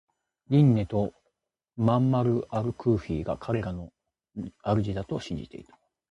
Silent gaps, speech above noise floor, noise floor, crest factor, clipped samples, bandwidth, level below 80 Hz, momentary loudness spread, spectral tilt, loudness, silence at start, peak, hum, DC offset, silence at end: none; 52 dB; -78 dBFS; 18 dB; under 0.1%; 8.4 kHz; -50 dBFS; 18 LU; -9 dB/octave; -27 LUFS; 0.5 s; -10 dBFS; none; under 0.1%; 0.5 s